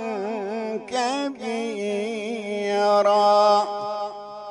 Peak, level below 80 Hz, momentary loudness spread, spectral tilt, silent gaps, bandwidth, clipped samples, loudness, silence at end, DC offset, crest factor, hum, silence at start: -8 dBFS; -72 dBFS; 12 LU; -4 dB/octave; none; 11 kHz; under 0.1%; -23 LUFS; 0 s; under 0.1%; 16 dB; none; 0 s